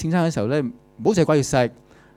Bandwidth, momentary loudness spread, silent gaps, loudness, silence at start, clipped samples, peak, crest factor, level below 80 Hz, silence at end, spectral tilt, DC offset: 13.5 kHz; 7 LU; none; -21 LUFS; 0 s; under 0.1%; -4 dBFS; 16 dB; -48 dBFS; 0.45 s; -6 dB/octave; under 0.1%